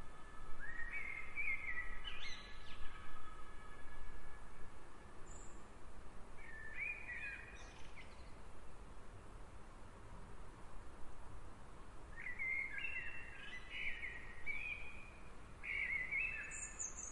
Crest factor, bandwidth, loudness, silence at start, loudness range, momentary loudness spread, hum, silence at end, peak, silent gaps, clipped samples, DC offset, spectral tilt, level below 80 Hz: 16 dB; 11 kHz; -46 LUFS; 0 s; 15 LU; 19 LU; none; 0 s; -28 dBFS; none; under 0.1%; under 0.1%; -2 dB/octave; -56 dBFS